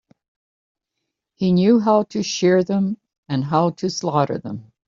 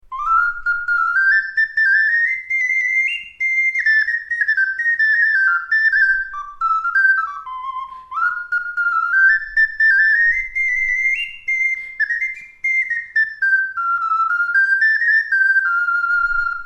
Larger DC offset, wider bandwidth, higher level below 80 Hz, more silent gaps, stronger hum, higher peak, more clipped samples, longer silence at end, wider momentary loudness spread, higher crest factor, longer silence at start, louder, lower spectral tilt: neither; second, 7.4 kHz vs 10.5 kHz; second, -62 dBFS vs -48 dBFS; first, 3.18-3.23 s vs none; neither; about the same, -4 dBFS vs -6 dBFS; neither; first, 0.25 s vs 0 s; first, 11 LU vs 8 LU; about the same, 16 dB vs 12 dB; first, 1.4 s vs 0.1 s; second, -19 LUFS vs -16 LUFS; first, -6 dB/octave vs 1.5 dB/octave